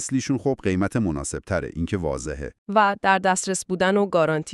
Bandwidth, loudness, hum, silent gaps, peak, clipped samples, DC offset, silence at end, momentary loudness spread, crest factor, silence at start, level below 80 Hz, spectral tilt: 12.5 kHz; -23 LUFS; none; 2.58-2.66 s; -4 dBFS; under 0.1%; under 0.1%; 0 s; 9 LU; 20 dB; 0 s; -44 dBFS; -5 dB/octave